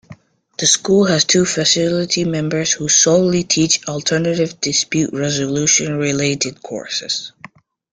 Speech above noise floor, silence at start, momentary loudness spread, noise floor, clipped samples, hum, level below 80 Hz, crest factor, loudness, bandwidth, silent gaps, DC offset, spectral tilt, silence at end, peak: 26 dB; 0.1 s; 10 LU; -43 dBFS; under 0.1%; none; -54 dBFS; 16 dB; -15 LUFS; 10.5 kHz; none; under 0.1%; -3 dB/octave; 0.65 s; 0 dBFS